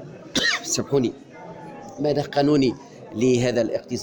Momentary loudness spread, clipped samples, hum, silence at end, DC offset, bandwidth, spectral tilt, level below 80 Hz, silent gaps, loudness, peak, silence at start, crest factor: 19 LU; under 0.1%; none; 0 s; under 0.1%; 19 kHz; -4.5 dB/octave; -54 dBFS; none; -22 LUFS; -10 dBFS; 0 s; 14 dB